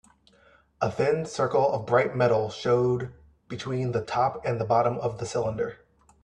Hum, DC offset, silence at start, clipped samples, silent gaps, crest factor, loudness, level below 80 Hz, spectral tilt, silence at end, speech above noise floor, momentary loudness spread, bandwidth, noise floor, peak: none; under 0.1%; 0.8 s; under 0.1%; none; 20 dB; -26 LUFS; -58 dBFS; -6.5 dB/octave; 0.5 s; 34 dB; 9 LU; 10 kHz; -60 dBFS; -6 dBFS